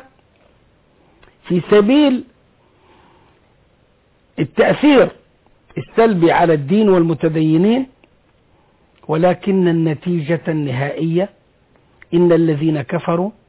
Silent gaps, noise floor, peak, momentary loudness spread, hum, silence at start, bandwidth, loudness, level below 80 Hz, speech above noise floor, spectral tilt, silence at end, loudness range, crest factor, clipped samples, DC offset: none; -56 dBFS; -4 dBFS; 10 LU; none; 1.45 s; 4 kHz; -15 LUFS; -54 dBFS; 42 dB; -11.5 dB/octave; 0.15 s; 4 LU; 14 dB; under 0.1%; under 0.1%